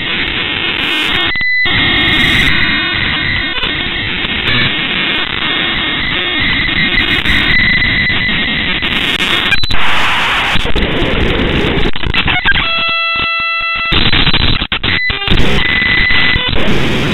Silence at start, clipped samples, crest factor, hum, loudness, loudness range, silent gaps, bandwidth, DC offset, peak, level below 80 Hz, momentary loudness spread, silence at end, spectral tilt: 0 s; under 0.1%; 12 dB; none; -11 LUFS; 2 LU; none; 15.5 kHz; under 0.1%; 0 dBFS; -22 dBFS; 5 LU; 0 s; -4.5 dB/octave